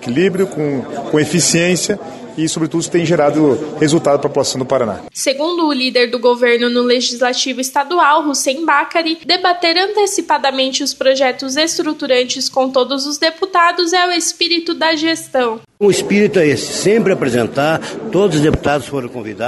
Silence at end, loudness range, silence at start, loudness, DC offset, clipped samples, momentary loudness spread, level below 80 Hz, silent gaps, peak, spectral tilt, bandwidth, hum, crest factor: 0 s; 1 LU; 0 s; -14 LUFS; under 0.1%; under 0.1%; 6 LU; -46 dBFS; none; 0 dBFS; -3.5 dB/octave; 12.5 kHz; none; 14 dB